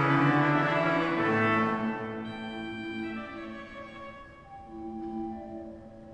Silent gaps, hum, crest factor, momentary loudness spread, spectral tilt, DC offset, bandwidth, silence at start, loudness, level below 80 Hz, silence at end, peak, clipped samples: none; none; 18 dB; 21 LU; -7.5 dB/octave; under 0.1%; 9.4 kHz; 0 s; -29 LUFS; -58 dBFS; 0 s; -12 dBFS; under 0.1%